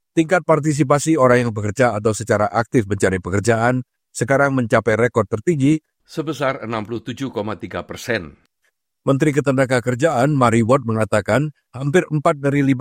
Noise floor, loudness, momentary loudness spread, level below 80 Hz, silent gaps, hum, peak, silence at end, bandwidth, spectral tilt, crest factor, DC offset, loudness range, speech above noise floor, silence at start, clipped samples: -69 dBFS; -18 LUFS; 11 LU; -52 dBFS; none; none; 0 dBFS; 0 s; 16 kHz; -6.5 dB/octave; 18 dB; under 0.1%; 6 LU; 52 dB; 0.15 s; under 0.1%